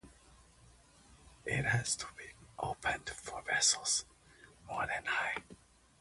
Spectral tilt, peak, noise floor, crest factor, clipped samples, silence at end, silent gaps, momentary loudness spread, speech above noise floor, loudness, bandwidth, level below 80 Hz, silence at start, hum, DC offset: -1.5 dB/octave; -18 dBFS; -63 dBFS; 22 dB; under 0.1%; 0.45 s; none; 17 LU; 26 dB; -35 LUFS; 11.5 kHz; -62 dBFS; 0.05 s; none; under 0.1%